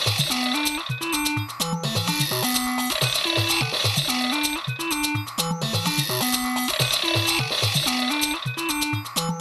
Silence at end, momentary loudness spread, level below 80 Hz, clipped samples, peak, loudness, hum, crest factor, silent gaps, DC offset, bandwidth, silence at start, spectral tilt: 0 s; 5 LU; -50 dBFS; under 0.1%; -6 dBFS; -22 LUFS; none; 18 dB; none; under 0.1%; 14 kHz; 0 s; -3 dB/octave